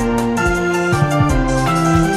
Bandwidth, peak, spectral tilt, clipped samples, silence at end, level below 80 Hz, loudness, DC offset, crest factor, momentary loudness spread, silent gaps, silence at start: 15 kHz; -2 dBFS; -6 dB/octave; under 0.1%; 0 s; -26 dBFS; -16 LUFS; under 0.1%; 14 dB; 2 LU; none; 0 s